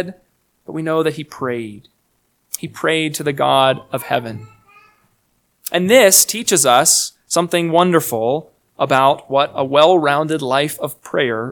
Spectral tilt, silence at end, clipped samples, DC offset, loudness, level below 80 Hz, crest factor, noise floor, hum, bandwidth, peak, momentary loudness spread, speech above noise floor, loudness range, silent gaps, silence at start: -3 dB/octave; 0 s; under 0.1%; under 0.1%; -15 LUFS; -62 dBFS; 18 dB; -64 dBFS; none; over 20 kHz; 0 dBFS; 16 LU; 48 dB; 7 LU; none; 0 s